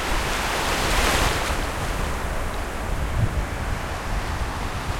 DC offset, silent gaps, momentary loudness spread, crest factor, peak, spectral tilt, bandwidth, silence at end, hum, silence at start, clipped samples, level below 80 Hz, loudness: under 0.1%; none; 8 LU; 16 dB; -8 dBFS; -3.5 dB/octave; 16.5 kHz; 0 s; none; 0 s; under 0.1%; -28 dBFS; -25 LUFS